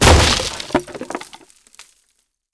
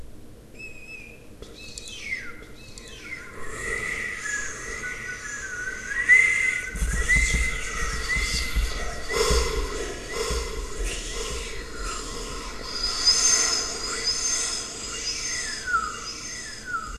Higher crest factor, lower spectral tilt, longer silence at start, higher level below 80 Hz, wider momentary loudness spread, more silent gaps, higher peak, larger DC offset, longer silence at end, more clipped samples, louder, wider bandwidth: about the same, 16 dB vs 20 dB; first, -3.5 dB/octave vs -1 dB/octave; about the same, 0 s vs 0 s; first, -24 dBFS vs -34 dBFS; about the same, 19 LU vs 20 LU; neither; first, -2 dBFS vs -6 dBFS; neither; first, 0.7 s vs 0 s; neither; first, -17 LUFS vs -25 LUFS; second, 11 kHz vs 13.5 kHz